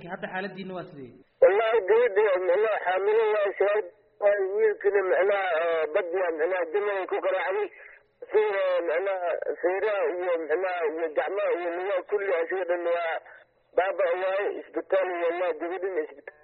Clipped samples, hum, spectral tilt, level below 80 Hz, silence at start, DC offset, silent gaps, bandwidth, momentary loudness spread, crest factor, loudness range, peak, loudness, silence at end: under 0.1%; none; -2 dB/octave; -72 dBFS; 0 s; under 0.1%; none; 4.3 kHz; 10 LU; 18 dB; 4 LU; -8 dBFS; -26 LUFS; 0.15 s